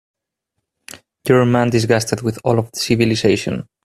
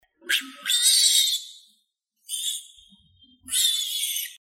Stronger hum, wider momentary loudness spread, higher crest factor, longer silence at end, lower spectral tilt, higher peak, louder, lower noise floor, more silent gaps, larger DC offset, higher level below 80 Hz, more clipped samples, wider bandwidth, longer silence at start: neither; second, 7 LU vs 13 LU; about the same, 18 dB vs 22 dB; first, 0.2 s vs 0.05 s; first, -5.5 dB/octave vs 4.5 dB/octave; first, 0 dBFS vs -4 dBFS; first, -17 LUFS vs -21 LUFS; first, -77 dBFS vs -72 dBFS; neither; neither; first, -50 dBFS vs -72 dBFS; neither; second, 14.5 kHz vs 16.5 kHz; first, 1.25 s vs 0.25 s